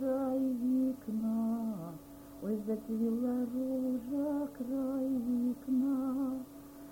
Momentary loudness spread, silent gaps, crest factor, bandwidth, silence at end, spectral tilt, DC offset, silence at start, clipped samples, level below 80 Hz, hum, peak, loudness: 11 LU; none; 10 dB; 17 kHz; 0 s; -8 dB/octave; under 0.1%; 0 s; under 0.1%; -66 dBFS; none; -24 dBFS; -35 LUFS